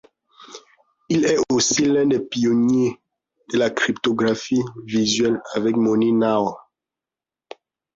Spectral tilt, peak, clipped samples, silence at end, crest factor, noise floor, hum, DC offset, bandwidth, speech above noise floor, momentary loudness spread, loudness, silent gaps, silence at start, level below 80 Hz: -4 dB/octave; -6 dBFS; under 0.1%; 1.35 s; 14 dB; -89 dBFS; none; under 0.1%; 7.8 kHz; 70 dB; 6 LU; -20 LUFS; none; 0.4 s; -60 dBFS